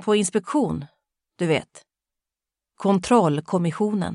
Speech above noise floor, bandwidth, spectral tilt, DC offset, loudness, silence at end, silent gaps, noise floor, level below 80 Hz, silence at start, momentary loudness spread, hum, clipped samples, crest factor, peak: 67 dB; 11.5 kHz; -5.5 dB/octave; under 0.1%; -23 LUFS; 0 s; none; -88 dBFS; -56 dBFS; 0 s; 8 LU; none; under 0.1%; 20 dB; -4 dBFS